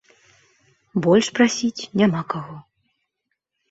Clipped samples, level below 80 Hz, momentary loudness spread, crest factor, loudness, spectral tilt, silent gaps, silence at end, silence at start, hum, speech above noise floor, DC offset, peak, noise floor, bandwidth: under 0.1%; -62 dBFS; 12 LU; 20 dB; -20 LUFS; -5 dB/octave; none; 1.1 s; 0.95 s; none; 59 dB; under 0.1%; -2 dBFS; -78 dBFS; 8 kHz